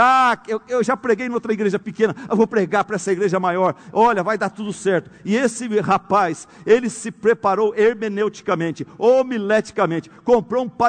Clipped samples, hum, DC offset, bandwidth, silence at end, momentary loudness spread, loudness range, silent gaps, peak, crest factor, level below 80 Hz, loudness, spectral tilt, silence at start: under 0.1%; none; under 0.1%; 9.4 kHz; 0 s; 6 LU; 1 LU; none; -2 dBFS; 16 dB; -58 dBFS; -19 LUFS; -5.5 dB/octave; 0 s